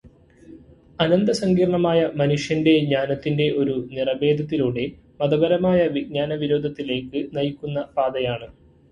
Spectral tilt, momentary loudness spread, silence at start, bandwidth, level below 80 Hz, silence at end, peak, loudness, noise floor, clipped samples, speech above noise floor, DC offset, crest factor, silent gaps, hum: -7 dB/octave; 8 LU; 0.05 s; 11.5 kHz; -52 dBFS; 0.4 s; -4 dBFS; -22 LUFS; -48 dBFS; under 0.1%; 27 dB; under 0.1%; 18 dB; none; none